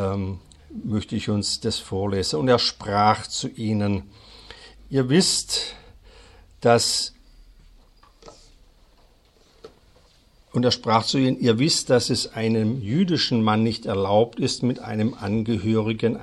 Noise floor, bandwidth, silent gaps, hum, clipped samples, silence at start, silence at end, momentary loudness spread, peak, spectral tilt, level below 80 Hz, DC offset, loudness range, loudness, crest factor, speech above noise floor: -57 dBFS; 13 kHz; none; none; under 0.1%; 0 s; 0 s; 10 LU; -4 dBFS; -4.5 dB/octave; -52 dBFS; under 0.1%; 5 LU; -22 LUFS; 20 dB; 35 dB